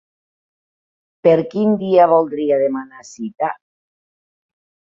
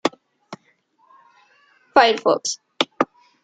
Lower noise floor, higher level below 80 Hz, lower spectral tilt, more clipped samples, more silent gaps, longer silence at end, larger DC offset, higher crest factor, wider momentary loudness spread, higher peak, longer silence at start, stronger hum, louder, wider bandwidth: first, under -90 dBFS vs -62 dBFS; about the same, -66 dBFS vs -66 dBFS; first, -7.5 dB/octave vs -2 dB/octave; neither; neither; first, 1.35 s vs 0.4 s; neither; about the same, 18 dB vs 22 dB; second, 18 LU vs 26 LU; about the same, -2 dBFS vs -2 dBFS; first, 1.25 s vs 0.05 s; neither; first, -16 LUFS vs -20 LUFS; second, 7.6 kHz vs 9.4 kHz